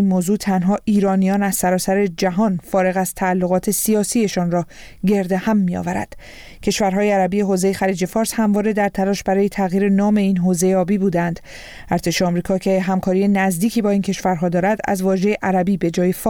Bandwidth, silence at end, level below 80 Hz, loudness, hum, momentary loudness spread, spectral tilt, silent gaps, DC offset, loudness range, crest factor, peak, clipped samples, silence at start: 19 kHz; 0 s; -46 dBFS; -18 LUFS; none; 5 LU; -5.5 dB/octave; none; 0.1%; 2 LU; 12 dB; -6 dBFS; under 0.1%; 0 s